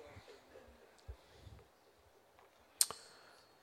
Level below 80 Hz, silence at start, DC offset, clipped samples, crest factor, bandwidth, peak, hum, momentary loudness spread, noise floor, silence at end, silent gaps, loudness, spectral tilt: -66 dBFS; 0 s; under 0.1%; under 0.1%; 42 dB; 16.5 kHz; -6 dBFS; none; 27 LU; -68 dBFS; 0.2 s; none; -36 LUFS; 0 dB/octave